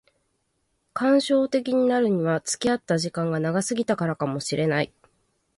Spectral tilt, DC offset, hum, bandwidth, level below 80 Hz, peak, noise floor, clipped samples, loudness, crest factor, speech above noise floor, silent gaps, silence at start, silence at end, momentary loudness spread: -5 dB/octave; under 0.1%; none; 11.5 kHz; -64 dBFS; -10 dBFS; -73 dBFS; under 0.1%; -24 LUFS; 16 dB; 50 dB; none; 0.95 s; 0.7 s; 6 LU